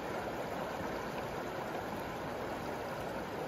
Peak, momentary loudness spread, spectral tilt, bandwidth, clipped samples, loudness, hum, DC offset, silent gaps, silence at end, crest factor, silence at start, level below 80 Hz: -26 dBFS; 1 LU; -5 dB/octave; 16 kHz; under 0.1%; -40 LUFS; none; under 0.1%; none; 0 s; 12 dB; 0 s; -58 dBFS